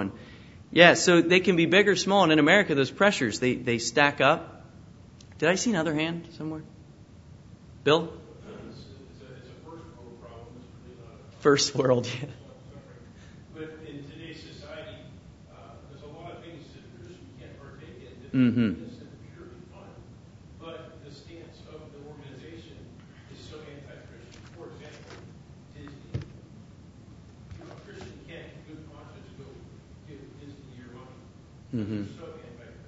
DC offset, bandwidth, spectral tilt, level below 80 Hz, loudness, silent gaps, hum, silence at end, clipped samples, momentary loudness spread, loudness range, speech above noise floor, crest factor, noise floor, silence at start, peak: under 0.1%; 8 kHz; -4.5 dB/octave; -58 dBFS; -23 LUFS; none; none; 0.15 s; under 0.1%; 27 LU; 24 LU; 27 dB; 28 dB; -50 dBFS; 0 s; 0 dBFS